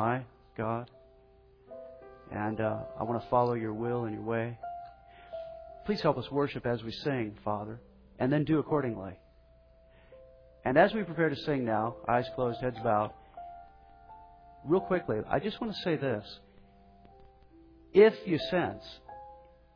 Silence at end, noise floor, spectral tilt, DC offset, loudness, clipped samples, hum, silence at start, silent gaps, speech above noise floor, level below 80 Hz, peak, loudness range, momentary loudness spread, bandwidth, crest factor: 0.35 s; -60 dBFS; -5.5 dB/octave; under 0.1%; -31 LUFS; under 0.1%; none; 0 s; none; 30 dB; -60 dBFS; -10 dBFS; 4 LU; 21 LU; 5.4 kHz; 22 dB